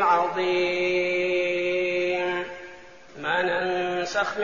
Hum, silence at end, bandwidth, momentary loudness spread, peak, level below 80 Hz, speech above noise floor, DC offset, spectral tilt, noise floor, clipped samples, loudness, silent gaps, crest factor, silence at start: none; 0 s; 7.2 kHz; 8 LU; -8 dBFS; -62 dBFS; 22 dB; 0.3%; -2 dB/octave; -46 dBFS; under 0.1%; -25 LUFS; none; 16 dB; 0 s